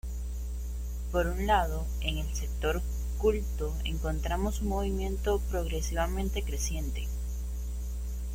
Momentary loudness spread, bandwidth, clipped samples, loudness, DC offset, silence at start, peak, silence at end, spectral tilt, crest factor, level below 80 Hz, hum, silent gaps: 8 LU; 16.5 kHz; under 0.1%; -32 LUFS; under 0.1%; 0.05 s; -12 dBFS; 0 s; -5 dB/octave; 18 dB; -32 dBFS; 60 Hz at -30 dBFS; none